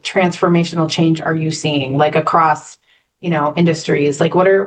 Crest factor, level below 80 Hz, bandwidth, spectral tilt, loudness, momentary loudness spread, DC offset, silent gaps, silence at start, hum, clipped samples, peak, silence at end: 14 dB; -60 dBFS; 9.4 kHz; -6 dB/octave; -15 LUFS; 5 LU; under 0.1%; none; 0.05 s; none; under 0.1%; -2 dBFS; 0 s